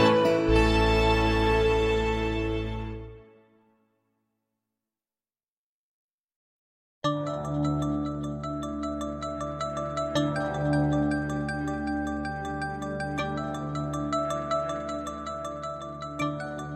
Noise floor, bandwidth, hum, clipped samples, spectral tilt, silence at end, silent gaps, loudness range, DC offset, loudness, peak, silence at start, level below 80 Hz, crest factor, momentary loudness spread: under -90 dBFS; 14.5 kHz; none; under 0.1%; -6 dB/octave; 0 s; 5.50-6.28 s, 6.36-7.01 s; 10 LU; under 0.1%; -28 LUFS; -10 dBFS; 0 s; -38 dBFS; 20 dB; 12 LU